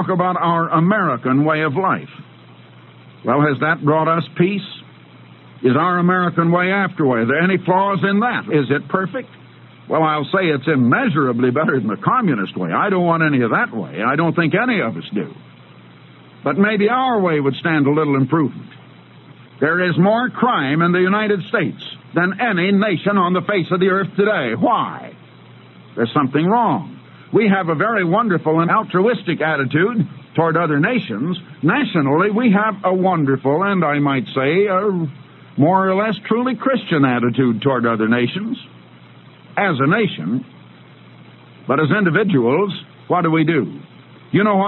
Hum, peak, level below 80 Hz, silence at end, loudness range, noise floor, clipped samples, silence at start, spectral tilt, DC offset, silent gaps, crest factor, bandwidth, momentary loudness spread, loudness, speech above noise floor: none; 0 dBFS; -66 dBFS; 0 s; 3 LU; -43 dBFS; under 0.1%; 0 s; -11 dB/octave; under 0.1%; none; 16 dB; 4.3 kHz; 8 LU; -17 LUFS; 27 dB